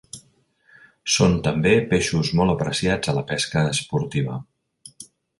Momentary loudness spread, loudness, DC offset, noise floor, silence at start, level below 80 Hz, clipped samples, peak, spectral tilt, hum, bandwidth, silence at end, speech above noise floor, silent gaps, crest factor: 17 LU; -21 LUFS; under 0.1%; -60 dBFS; 0.15 s; -44 dBFS; under 0.1%; -4 dBFS; -5 dB/octave; none; 11.5 kHz; 0.35 s; 40 dB; none; 20 dB